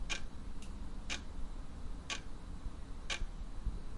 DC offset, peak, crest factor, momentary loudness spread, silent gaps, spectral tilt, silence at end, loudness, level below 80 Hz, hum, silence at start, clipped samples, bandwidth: under 0.1%; -22 dBFS; 18 dB; 9 LU; none; -3 dB/octave; 0 s; -46 LUFS; -44 dBFS; none; 0 s; under 0.1%; 11.5 kHz